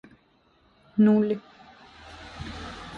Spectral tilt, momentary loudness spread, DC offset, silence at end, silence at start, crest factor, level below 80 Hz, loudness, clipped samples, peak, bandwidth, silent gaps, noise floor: -8 dB/octave; 24 LU; under 0.1%; 0 s; 0.95 s; 16 dB; -52 dBFS; -24 LUFS; under 0.1%; -12 dBFS; 7.2 kHz; none; -63 dBFS